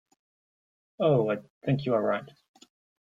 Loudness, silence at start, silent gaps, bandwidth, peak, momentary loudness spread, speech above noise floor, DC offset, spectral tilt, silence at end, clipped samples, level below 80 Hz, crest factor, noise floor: -28 LUFS; 1 s; 1.50-1.61 s; 7.4 kHz; -12 dBFS; 8 LU; over 63 dB; under 0.1%; -8.5 dB/octave; 0.75 s; under 0.1%; -68 dBFS; 18 dB; under -90 dBFS